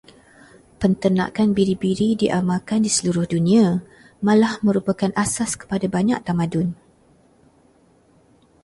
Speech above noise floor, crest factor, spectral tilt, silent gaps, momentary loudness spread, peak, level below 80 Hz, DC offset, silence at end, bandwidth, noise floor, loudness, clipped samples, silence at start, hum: 37 dB; 16 dB; -5.5 dB/octave; none; 7 LU; -4 dBFS; -52 dBFS; under 0.1%; 1.9 s; 11.5 kHz; -56 dBFS; -20 LUFS; under 0.1%; 0.8 s; none